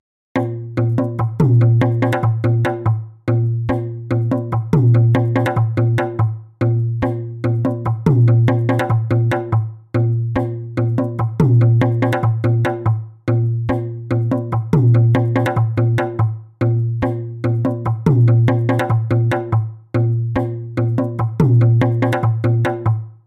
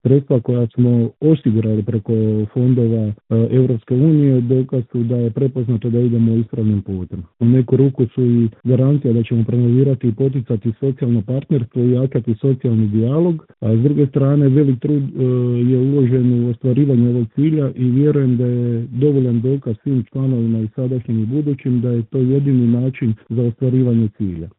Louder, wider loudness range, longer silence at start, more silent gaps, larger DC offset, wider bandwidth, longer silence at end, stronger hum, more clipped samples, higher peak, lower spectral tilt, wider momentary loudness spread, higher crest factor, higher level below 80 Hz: about the same, -17 LUFS vs -17 LUFS; about the same, 1 LU vs 2 LU; first, 0.35 s vs 0.05 s; neither; neither; first, 4.3 kHz vs 3.9 kHz; about the same, 0.15 s vs 0.1 s; neither; neither; about the same, -2 dBFS vs 0 dBFS; second, -9.5 dB/octave vs -14.5 dB/octave; about the same, 8 LU vs 6 LU; about the same, 14 dB vs 16 dB; first, -44 dBFS vs -54 dBFS